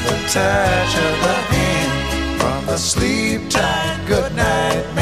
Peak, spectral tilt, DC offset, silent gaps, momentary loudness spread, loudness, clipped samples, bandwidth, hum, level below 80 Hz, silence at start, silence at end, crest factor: -2 dBFS; -4 dB/octave; 0.5%; none; 4 LU; -17 LUFS; under 0.1%; 15.5 kHz; none; -30 dBFS; 0 s; 0 s; 14 dB